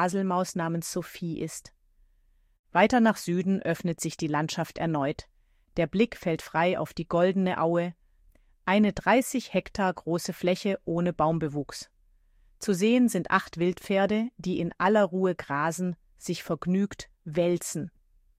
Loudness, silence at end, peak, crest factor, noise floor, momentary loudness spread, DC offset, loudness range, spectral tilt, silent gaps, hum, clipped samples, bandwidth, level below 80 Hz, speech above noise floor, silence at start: -27 LUFS; 0.5 s; -8 dBFS; 20 dB; -64 dBFS; 12 LU; under 0.1%; 3 LU; -5.5 dB/octave; 2.59-2.64 s; none; under 0.1%; 15.5 kHz; -58 dBFS; 37 dB; 0 s